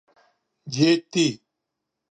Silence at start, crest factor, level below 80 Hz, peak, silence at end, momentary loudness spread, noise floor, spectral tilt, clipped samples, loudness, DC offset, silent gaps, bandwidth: 0.65 s; 20 dB; -70 dBFS; -6 dBFS; 0.75 s; 14 LU; -82 dBFS; -4.5 dB/octave; under 0.1%; -22 LUFS; under 0.1%; none; 9.4 kHz